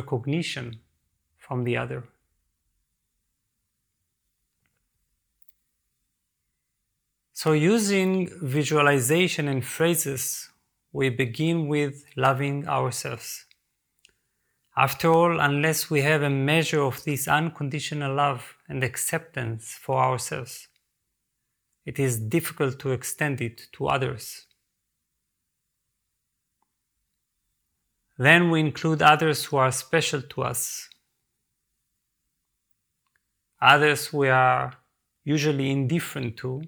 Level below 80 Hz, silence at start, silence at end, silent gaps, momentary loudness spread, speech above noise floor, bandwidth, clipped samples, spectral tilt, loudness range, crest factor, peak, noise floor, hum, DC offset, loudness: -64 dBFS; 0 s; 0 s; none; 15 LU; 56 dB; over 20 kHz; under 0.1%; -4.5 dB/octave; 11 LU; 24 dB; -2 dBFS; -79 dBFS; none; under 0.1%; -24 LUFS